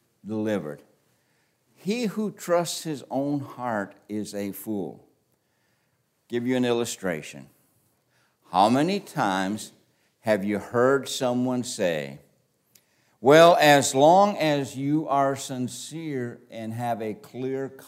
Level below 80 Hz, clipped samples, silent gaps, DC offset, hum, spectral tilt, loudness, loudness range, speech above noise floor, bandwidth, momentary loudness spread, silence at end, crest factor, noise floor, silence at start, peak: -74 dBFS; under 0.1%; none; under 0.1%; none; -4.5 dB/octave; -24 LUFS; 11 LU; 47 dB; 16 kHz; 17 LU; 0 s; 22 dB; -71 dBFS; 0.25 s; -2 dBFS